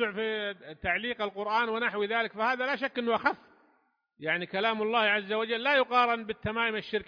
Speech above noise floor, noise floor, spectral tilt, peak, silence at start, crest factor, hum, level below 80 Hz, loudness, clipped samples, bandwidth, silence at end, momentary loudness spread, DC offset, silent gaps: 42 dB; -71 dBFS; -5.5 dB/octave; -12 dBFS; 0 s; 18 dB; none; -62 dBFS; -29 LUFS; under 0.1%; 5.2 kHz; 0.05 s; 8 LU; under 0.1%; none